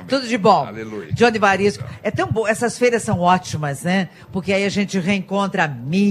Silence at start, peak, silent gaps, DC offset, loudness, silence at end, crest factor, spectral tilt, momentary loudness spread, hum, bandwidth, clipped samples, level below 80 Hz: 0 s; 0 dBFS; none; under 0.1%; -19 LUFS; 0 s; 18 dB; -5.5 dB/octave; 10 LU; none; 14 kHz; under 0.1%; -52 dBFS